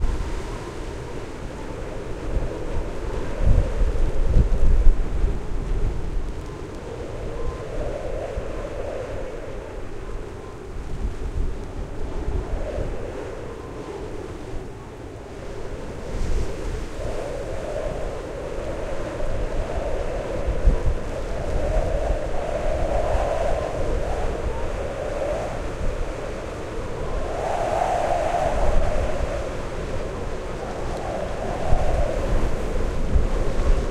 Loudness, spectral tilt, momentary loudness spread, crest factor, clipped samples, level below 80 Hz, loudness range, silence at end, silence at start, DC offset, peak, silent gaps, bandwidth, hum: -28 LUFS; -6.5 dB/octave; 11 LU; 22 dB; under 0.1%; -26 dBFS; 8 LU; 0 s; 0 s; under 0.1%; 0 dBFS; none; 10.5 kHz; none